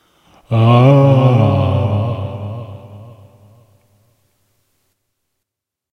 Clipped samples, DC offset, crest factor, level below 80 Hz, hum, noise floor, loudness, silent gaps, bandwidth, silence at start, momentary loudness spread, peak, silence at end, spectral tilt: under 0.1%; under 0.1%; 16 dB; -50 dBFS; none; -81 dBFS; -13 LUFS; none; 6 kHz; 0.5 s; 20 LU; 0 dBFS; 2.85 s; -9.5 dB/octave